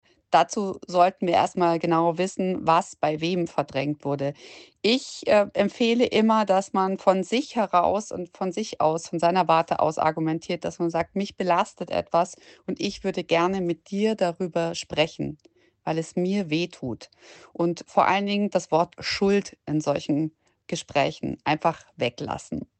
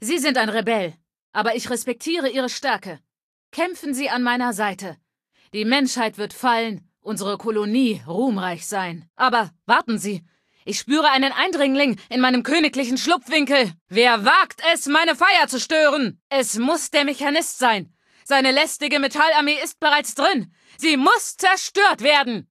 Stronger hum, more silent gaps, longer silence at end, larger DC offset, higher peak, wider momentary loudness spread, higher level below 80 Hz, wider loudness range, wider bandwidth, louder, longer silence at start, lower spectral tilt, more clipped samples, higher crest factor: neither; second, none vs 1.19-1.33 s, 3.23-3.52 s, 9.10-9.14 s, 13.81-13.86 s, 16.21-16.30 s; about the same, 0.15 s vs 0.1 s; neither; second, -6 dBFS vs -2 dBFS; about the same, 9 LU vs 10 LU; first, -60 dBFS vs -72 dBFS; second, 4 LU vs 7 LU; second, 9 kHz vs 14.5 kHz; second, -25 LUFS vs -19 LUFS; first, 0.3 s vs 0 s; first, -5.5 dB/octave vs -2.5 dB/octave; neither; about the same, 18 dB vs 18 dB